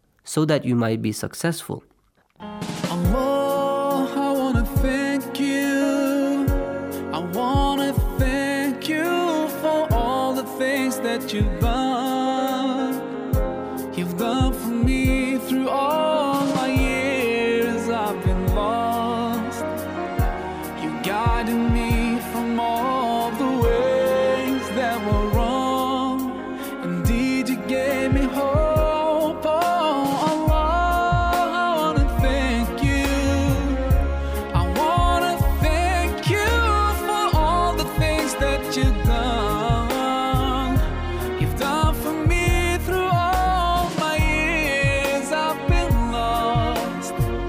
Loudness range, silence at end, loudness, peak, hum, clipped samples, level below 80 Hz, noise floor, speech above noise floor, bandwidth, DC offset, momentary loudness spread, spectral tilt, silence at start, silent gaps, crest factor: 3 LU; 0 s; -22 LUFS; -8 dBFS; none; under 0.1%; -28 dBFS; -61 dBFS; 39 dB; 16 kHz; under 0.1%; 6 LU; -5.5 dB/octave; 0.25 s; none; 12 dB